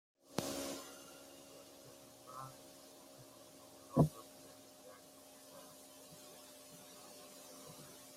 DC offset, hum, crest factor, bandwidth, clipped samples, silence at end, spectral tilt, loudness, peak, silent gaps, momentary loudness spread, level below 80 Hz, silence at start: under 0.1%; none; 32 dB; 16 kHz; under 0.1%; 0 s; -5.5 dB/octave; -44 LUFS; -14 dBFS; none; 18 LU; -72 dBFS; 0.25 s